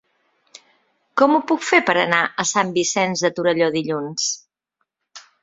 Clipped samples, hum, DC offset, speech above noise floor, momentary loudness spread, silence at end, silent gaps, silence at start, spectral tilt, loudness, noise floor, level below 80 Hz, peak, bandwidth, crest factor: under 0.1%; none; under 0.1%; 56 dB; 7 LU; 0.25 s; none; 1.15 s; -3 dB/octave; -19 LUFS; -75 dBFS; -66 dBFS; 0 dBFS; 8 kHz; 20 dB